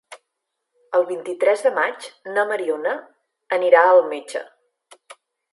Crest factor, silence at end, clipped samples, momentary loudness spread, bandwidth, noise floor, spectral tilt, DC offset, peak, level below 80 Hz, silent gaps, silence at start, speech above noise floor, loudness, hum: 20 dB; 0.4 s; under 0.1%; 16 LU; 11.5 kHz; -79 dBFS; -3 dB/octave; under 0.1%; 0 dBFS; -84 dBFS; none; 0.1 s; 60 dB; -19 LUFS; none